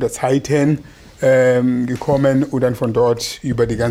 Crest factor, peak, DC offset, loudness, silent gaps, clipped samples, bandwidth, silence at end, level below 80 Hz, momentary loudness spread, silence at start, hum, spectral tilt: 12 dB; -4 dBFS; under 0.1%; -17 LUFS; none; under 0.1%; 16 kHz; 0 s; -42 dBFS; 6 LU; 0 s; none; -6.5 dB/octave